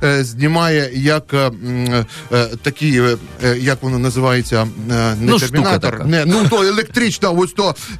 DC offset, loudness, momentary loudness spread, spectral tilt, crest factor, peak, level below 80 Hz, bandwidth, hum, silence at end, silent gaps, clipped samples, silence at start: under 0.1%; -15 LUFS; 5 LU; -5.5 dB/octave; 12 dB; -4 dBFS; -40 dBFS; 14 kHz; none; 0 s; none; under 0.1%; 0 s